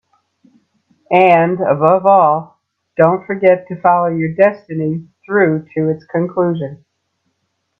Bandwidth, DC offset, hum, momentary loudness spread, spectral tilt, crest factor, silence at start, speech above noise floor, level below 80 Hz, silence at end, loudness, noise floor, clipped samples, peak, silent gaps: 5.8 kHz; under 0.1%; none; 11 LU; -9.5 dB/octave; 16 dB; 1.1 s; 56 dB; -60 dBFS; 1.05 s; -14 LUFS; -69 dBFS; under 0.1%; 0 dBFS; none